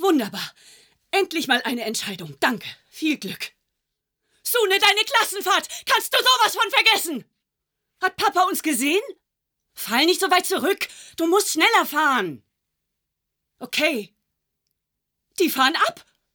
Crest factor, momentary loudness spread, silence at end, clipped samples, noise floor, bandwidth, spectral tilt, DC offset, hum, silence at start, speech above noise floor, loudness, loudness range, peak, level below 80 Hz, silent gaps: 20 dB; 15 LU; 0.35 s; under 0.1%; -81 dBFS; over 20 kHz; -1.5 dB/octave; under 0.1%; none; 0 s; 59 dB; -20 LUFS; 7 LU; -2 dBFS; -72 dBFS; none